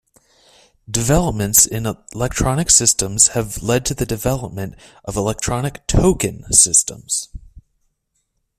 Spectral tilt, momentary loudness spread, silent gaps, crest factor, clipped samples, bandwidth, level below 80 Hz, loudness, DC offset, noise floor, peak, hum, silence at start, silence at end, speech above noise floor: -3.5 dB/octave; 14 LU; none; 18 dB; under 0.1%; 16 kHz; -32 dBFS; -16 LUFS; under 0.1%; -70 dBFS; 0 dBFS; none; 0.9 s; 1 s; 52 dB